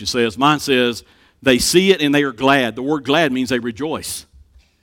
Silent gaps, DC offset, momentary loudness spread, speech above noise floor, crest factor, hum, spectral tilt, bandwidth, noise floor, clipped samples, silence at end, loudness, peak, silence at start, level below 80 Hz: none; under 0.1%; 11 LU; 32 dB; 16 dB; none; -4 dB/octave; 18 kHz; -49 dBFS; under 0.1%; 0.6 s; -16 LUFS; 0 dBFS; 0 s; -46 dBFS